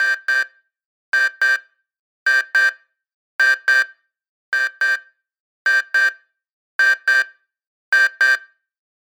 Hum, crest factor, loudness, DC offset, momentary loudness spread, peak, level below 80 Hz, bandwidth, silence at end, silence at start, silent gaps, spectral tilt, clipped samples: none; 16 dB; -17 LUFS; under 0.1%; 9 LU; -4 dBFS; under -90 dBFS; over 20 kHz; 0.65 s; 0 s; 0.86-1.12 s, 1.99-2.26 s, 3.14-3.39 s, 4.29-4.52 s, 5.40-5.65 s, 6.53-6.79 s, 7.67-7.92 s; 5 dB/octave; under 0.1%